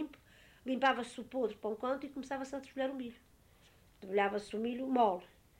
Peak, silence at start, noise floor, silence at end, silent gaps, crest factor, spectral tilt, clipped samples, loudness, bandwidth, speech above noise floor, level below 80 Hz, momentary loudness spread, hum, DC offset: -18 dBFS; 0 s; -65 dBFS; 0.35 s; none; 20 dB; -5 dB/octave; under 0.1%; -36 LUFS; 16 kHz; 29 dB; -70 dBFS; 13 LU; none; under 0.1%